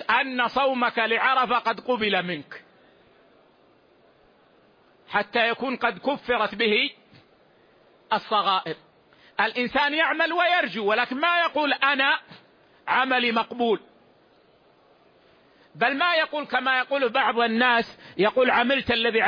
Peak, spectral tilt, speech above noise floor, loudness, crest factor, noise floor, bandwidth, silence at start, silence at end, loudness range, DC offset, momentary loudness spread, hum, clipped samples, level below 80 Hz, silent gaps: -8 dBFS; -5.5 dB/octave; 35 dB; -23 LUFS; 18 dB; -59 dBFS; 5.2 kHz; 0 s; 0 s; 7 LU; under 0.1%; 7 LU; none; under 0.1%; -64 dBFS; none